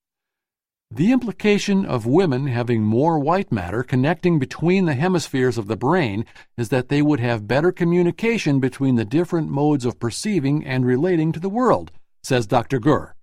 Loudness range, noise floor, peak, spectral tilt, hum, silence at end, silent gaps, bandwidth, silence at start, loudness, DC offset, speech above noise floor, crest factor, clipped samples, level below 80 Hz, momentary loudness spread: 1 LU; -89 dBFS; -2 dBFS; -7 dB/octave; none; 0.05 s; none; 14 kHz; 0.9 s; -20 LUFS; under 0.1%; 70 dB; 18 dB; under 0.1%; -50 dBFS; 5 LU